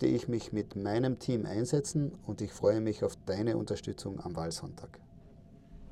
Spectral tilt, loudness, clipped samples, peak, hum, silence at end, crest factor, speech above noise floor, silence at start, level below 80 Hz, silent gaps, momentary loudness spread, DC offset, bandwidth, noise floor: -6.5 dB/octave; -34 LUFS; under 0.1%; -16 dBFS; none; 0 s; 18 dB; 22 dB; 0 s; -58 dBFS; none; 10 LU; under 0.1%; 13.5 kHz; -55 dBFS